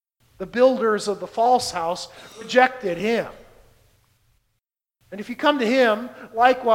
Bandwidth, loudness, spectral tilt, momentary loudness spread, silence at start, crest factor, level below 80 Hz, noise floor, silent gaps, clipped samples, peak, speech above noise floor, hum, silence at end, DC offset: 16 kHz; -21 LUFS; -4 dB/octave; 17 LU; 0.4 s; 22 dB; -60 dBFS; -77 dBFS; none; under 0.1%; -2 dBFS; 56 dB; none; 0 s; under 0.1%